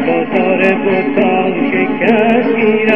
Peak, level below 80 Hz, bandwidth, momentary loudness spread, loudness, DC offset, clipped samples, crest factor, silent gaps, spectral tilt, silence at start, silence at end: 0 dBFS; -56 dBFS; 5.8 kHz; 3 LU; -12 LUFS; 2%; under 0.1%; 12 dB; none; -8 dB/octave; 0 s; 0 s